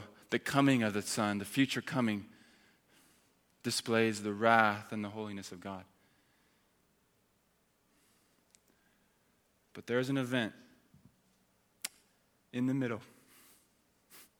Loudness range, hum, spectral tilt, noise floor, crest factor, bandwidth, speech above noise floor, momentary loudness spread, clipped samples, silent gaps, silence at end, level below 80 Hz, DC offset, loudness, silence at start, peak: 12 LU; none; -4.5 dB/octave; -74 dBFS; 28 dB; 19.5 kHz; 41 dB; 16 LU; under 0.1%; none; 0.15 s; -78 dBFS; under 0.1%; -33 LUFS; 0 s; -10 dBFS